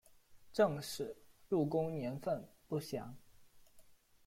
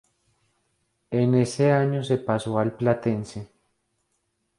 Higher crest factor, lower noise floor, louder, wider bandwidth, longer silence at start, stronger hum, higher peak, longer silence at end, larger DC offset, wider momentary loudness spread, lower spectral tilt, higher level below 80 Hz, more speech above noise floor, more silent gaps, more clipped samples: about the same, 20 dB vs 20 dB; second, -63 dBFS vs -74 dBFS; second, -39 LUFS vs -24 LUFS; first, 16.5 kHz vs 11.5 kHz; second, 0.3 s vs 1.1 s; neither; second, -20 dBFS vs -6 dBFS; second, 0.35 s vs 1.15 s; neither; first, 12 LU vs 9 LU; about the same, -6 dB/octave vs -7 dB/octave; second, -70 dBFS vs -60 dBFS; second, 25 dB vs 51 dB; neither; neither